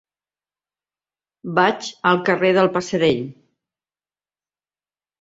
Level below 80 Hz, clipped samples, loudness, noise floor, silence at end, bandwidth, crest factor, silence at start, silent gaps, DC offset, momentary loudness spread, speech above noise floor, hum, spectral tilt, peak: -62 dBFS; under 0.1%; -19 LUFS; under -90 dBFS; 1.9 s; 8 kHz; 20 dB; 1.45 s; none; under 0.1%; 9 LU; over 72 dB; 50 Hz at -55 dBFS; -5.5 dB/octave; -2 dBFS